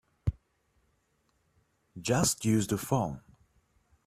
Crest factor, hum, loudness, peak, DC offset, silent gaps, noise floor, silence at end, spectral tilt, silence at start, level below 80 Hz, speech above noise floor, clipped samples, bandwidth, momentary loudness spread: 22 dB; none; -30 LUFS; -10 dBFS; under 0.1%; none; -74 dBFS; 0.9 s; -5 dB/octave; 0.25 s; -52 dBFS; 45 dB; under 0.1%; 15.5 kHz; 11 LU